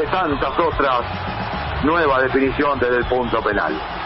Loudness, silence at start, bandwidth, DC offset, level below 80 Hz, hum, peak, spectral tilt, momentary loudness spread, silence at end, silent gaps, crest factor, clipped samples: -19 LUFS; 0 s; 5.8 kHz; under 0.1%; -36 dBFS; none; -6 dBFS; -10.5 dB/octave; 8 LU; 0 s; none; 14 dB; under 0.1%